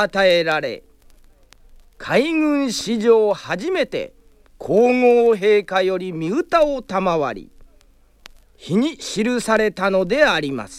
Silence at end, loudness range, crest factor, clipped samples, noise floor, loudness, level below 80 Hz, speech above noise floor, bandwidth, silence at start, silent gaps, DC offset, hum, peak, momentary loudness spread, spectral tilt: 0 s; 5 LU; 18 dB; under 0.1%; -52 dBFS; -18 LUFS; -48 dBFS; 34 dB; 14.5 kHz; 0 s; none; under 0.1%; none; -2 dBFS; 9 LU; -4.5 dB/octave